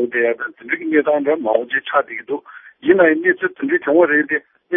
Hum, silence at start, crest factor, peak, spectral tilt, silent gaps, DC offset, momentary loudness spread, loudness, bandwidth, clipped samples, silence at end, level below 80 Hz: none; 0 s; 18 dB; 0 dBFS; -10 dB/octave; none; under 0.1%; 11 LU; -17 LUFS; 3.7 kHz; under 0.1%; 0 s; -66 dBFS